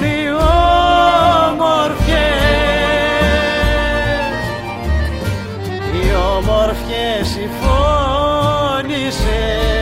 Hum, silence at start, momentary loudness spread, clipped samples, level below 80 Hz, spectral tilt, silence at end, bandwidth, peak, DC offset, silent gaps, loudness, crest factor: none; 0 s; 9 LU; under 0.1%; -22 dBFS; -5.5 dB/octave; 0 s; 16 kHz; 0 dBFS; under 0.1%; none; -15 LUFS; 14 dB